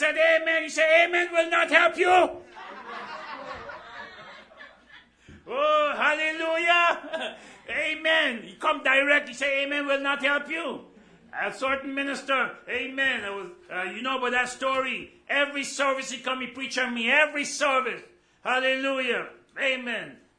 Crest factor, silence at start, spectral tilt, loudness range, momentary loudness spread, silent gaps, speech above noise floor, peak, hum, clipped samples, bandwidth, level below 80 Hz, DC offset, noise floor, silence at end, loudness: 24 dB; 0 s; -1.5 dB/octave; 5 LU; 18 LU; none; 28 dB; -2 dBFS; none; under 0.1%; 10.5 kHz; -66 dBFS; under 0.1%; -54 dBFS; 0.25 s; -24 LUFS